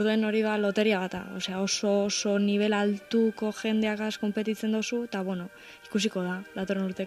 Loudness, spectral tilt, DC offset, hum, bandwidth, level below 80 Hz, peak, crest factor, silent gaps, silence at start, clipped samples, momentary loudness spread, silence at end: -28 LUFS; -4.5 dB/octave; under 0.1%; none; 13 kHz; -68 dBFS; -12 dBFS; 14 dB; none; 0 s; under 0.1%; 8 LU; 0 s